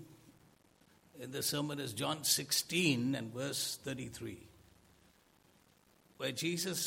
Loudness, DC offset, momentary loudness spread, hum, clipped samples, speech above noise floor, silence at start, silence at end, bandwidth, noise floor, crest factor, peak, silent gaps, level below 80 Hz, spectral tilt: -35 LUFS; under 0.1%; 14 LU; none; under 0.1%; 32 dB; 0 s; 0 s; 16.5 kHz; -68 dBFS; 22 dB; -18 dBFS; none; -74 dBFS; -3 dB/octave